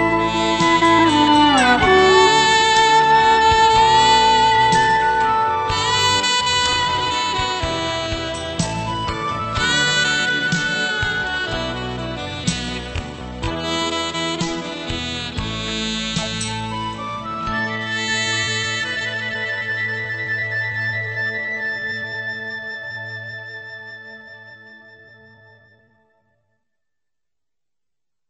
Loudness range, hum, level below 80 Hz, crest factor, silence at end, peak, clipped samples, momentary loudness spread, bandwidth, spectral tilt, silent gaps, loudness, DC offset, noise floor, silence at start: 13 LU; none; -40 dBFS; 18 dB; 3.5 s; 0 dBFS; under 0.1%; 14 LU; 8.6 kHz; -3 dB/octave; none; -18 LUFS; under 0.1%; -88 dBFS; 0 s